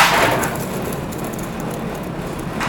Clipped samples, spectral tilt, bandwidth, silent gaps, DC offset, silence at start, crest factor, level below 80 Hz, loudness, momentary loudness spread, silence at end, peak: under 0.1%; -4 dB/octave; over 20 kHz; none; under 0.1%; 0 s; 20 dB; -38 dBFS; -21 LUFS; 11 LU; 0 s; 0 dBFS